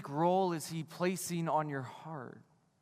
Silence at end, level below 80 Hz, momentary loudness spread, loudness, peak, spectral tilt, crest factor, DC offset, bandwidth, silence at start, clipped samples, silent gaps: 0.4 s; -82 dBFS; 15 LU; -35 LUFS; -18 dBFS; -5.5 dB/octave; 18 dB; under 0.1%; 15.5 kHz; 0 s; under 0.1%; none